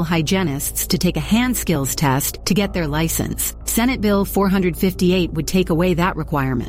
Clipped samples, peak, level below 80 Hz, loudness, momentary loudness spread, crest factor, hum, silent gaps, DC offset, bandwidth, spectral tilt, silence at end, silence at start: under 0.1%; -4 dBFS; -32 dBFS; -19 LUFS; 3 LU; 14 dB; none; none; under 0.1%; 17 kHz; -5 dB/octave; 0 s; 0 s